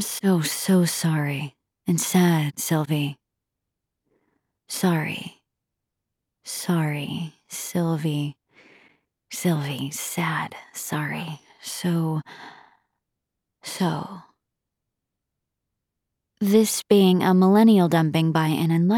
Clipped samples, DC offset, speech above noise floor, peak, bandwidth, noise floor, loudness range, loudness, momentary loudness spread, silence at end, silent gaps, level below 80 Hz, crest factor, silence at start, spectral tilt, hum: under 0.1%; under 0.1%; 61 dB; -6 dBFS; 18.5 kHz; -83 dBFS; 11 LU; -23 LUFS; 16 LU; 0 s; none; -72 dBFS; 18 dB; 0 s; -5.5 dB/octave; none